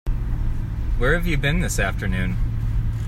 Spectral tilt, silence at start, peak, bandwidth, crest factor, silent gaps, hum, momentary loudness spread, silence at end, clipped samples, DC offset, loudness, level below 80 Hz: -5.5 dB/octave; 0.05 s; -6 dBFS; 14.5 kHz; 16 dB; none; none; 7 LU; 0 s; under 0.1%; under 0.1%; -24 LUFS; -24 dBFS